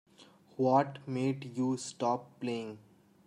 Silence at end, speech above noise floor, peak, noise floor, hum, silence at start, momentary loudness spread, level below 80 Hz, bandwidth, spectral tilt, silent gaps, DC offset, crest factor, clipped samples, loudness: 0.5 s; 28 dB; -14 dBFS; -60 dBFS; none; 0.2 s; 15 LU; -80 dBFS; 11 kHz; -6 dB/octave; none; under 0.1%; 20 dB; under 0.1%; -33 LUFS